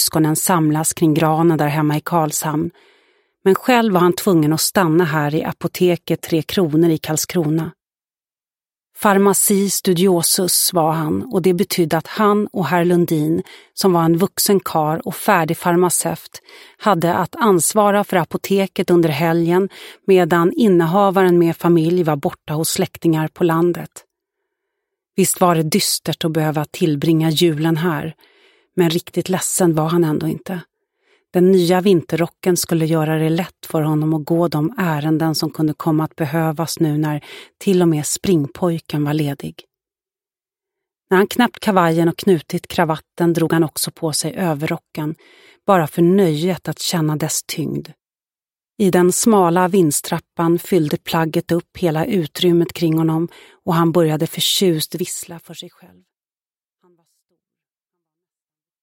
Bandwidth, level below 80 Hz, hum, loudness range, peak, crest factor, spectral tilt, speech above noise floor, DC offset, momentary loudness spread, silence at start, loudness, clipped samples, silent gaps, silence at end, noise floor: 17 kHz; -58 dBFS; none; 4 LU; 0 dBFS; 16 dB; -5 dB/octave; over 73 dB; under 0.1%; 9 LU; 0 s; -17 LUFS; under 0.1%; none; 3.15 s; under -90 dBFS